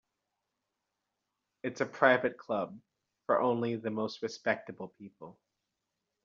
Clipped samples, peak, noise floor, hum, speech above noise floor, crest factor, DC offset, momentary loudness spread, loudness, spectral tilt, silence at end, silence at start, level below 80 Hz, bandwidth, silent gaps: under 0.1%; -8 dBFS; -86 dBFS; none; 54 dB; 26 dB; under 0.1%; 22 LU; -32 LUFS; -3.5 dB/octave; 0.95 s; 1.65 s; -80 dBFS; 7.4 kHz; none